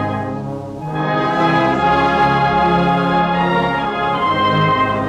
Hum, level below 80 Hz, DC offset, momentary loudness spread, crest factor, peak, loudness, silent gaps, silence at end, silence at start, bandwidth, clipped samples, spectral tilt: none; -40 dBFS; under 0.1%; 9 LU; 10 dB; -6 dBFS; -16 LUFS; none; 0 s; 0 s; 9.8 kHz; under 0.1%; -7 dB/octave